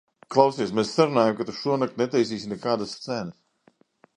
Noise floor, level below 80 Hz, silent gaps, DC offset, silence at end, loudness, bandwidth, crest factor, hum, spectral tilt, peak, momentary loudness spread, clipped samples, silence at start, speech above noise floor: -62 dBFS; -66 dBFS; none; under 0.1%; 0.85 s; -24 LUFS; 10.5 kHz; 24 dB; none; -5.5 dB/octave; -2 dBFS; 10 LU; under 0.1%; 0.3 s; 39 dB